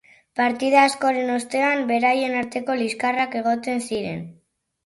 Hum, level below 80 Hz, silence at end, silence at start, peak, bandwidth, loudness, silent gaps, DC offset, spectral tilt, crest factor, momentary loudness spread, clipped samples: none; -64 dBFS; 0.55 s; 0.35 s; -4 dBFS; 11.5 kHz; -21 LUFS; none; under 0.1%; -4 dB/octave; 18 dB; 11 LU; under 0.1%